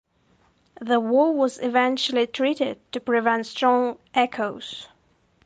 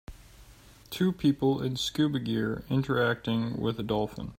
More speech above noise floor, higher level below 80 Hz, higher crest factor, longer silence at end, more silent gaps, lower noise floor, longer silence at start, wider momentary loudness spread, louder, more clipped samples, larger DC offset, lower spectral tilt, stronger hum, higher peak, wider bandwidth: first, 40 dB vs 25 dB; second, -70 dBFS vs -54 dBFS; about the same, 16 dB vs 16 dB; first, 0.6 s vs 0.05 s; neither; first, -63 dBFS vs -53 dBFS; first, 0.8 s vs 0.1 s; first, 11 LU vs 5 LU; first, -23 LUFS vs -29 LUFS; neither; neither; second, -4 dB/octave vs -6 dB/octave; neither; first, -6 dBFS vs -14 dBFS; second, 9.4 kHz vs 16 kHz